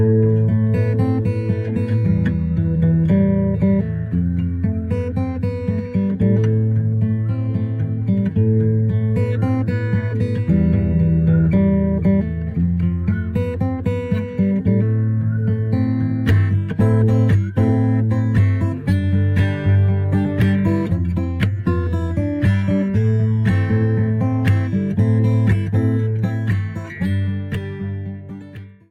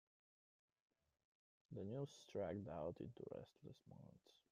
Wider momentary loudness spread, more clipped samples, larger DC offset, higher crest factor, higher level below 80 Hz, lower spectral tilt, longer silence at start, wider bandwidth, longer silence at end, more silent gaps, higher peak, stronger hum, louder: second, 6 LU vs 15 LU; neither; neither; second, 12 dB vs 20 dB; first, -38 dBFS vs -82 dBFS; first, -10 dB/octave vs -7.5 dB/octave; second, 0 s vs 1.7 s; second, 4.7 kHz vs 13.5 kHz; about the same, 0.2 s vs 0.2 s; neither; first, -6 dBFS vs -36 dBFS; neither; first, -18 LUFS vs -52 LUFS